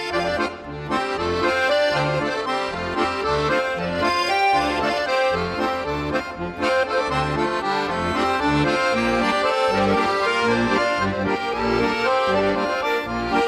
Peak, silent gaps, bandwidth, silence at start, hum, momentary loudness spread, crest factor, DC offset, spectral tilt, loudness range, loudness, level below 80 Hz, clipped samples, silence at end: -8 dBFS; none; 14.5 kHz; 0 s; none; 5 LU; 12 dB; under 0.1%; -5 dB/octave; 2 LU; -21 LUFS; -44 dBFS; under 0.1%; 0 s